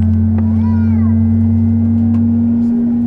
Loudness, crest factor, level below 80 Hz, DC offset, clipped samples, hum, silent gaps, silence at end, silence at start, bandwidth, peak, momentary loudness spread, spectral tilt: -13 LUFS; 8 dB; -34 dBFS; under 0.1%; under 0.1%; none; none; 0 s; 0 s; 2.5 kHz; -4 dBFS; 1 LU; -12 dB/octave